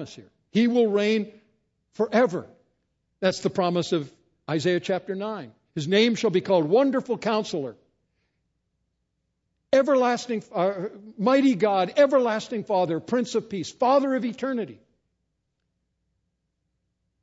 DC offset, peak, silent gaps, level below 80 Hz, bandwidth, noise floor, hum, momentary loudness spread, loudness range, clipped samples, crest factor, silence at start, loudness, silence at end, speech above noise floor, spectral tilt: under 0.1%; -6 dBFS; none; -70 dBFS; 8 kHz; -77 dBFS; none; 13 LU; 5 LU; under 0.1%; 18 dB; 0 s; -24 LUFS; 2.5 s; 54 dB; -5.5 dB/octave